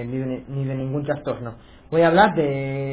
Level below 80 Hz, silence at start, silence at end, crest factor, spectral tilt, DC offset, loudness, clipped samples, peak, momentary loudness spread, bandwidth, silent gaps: -50 dBFS; 0 s; 0 s; 18 dB; -11 dB/octave; under 0.1%; -22 LUFS; under 0.1%; -4 dBFS; 13 LU; 4 kHz; none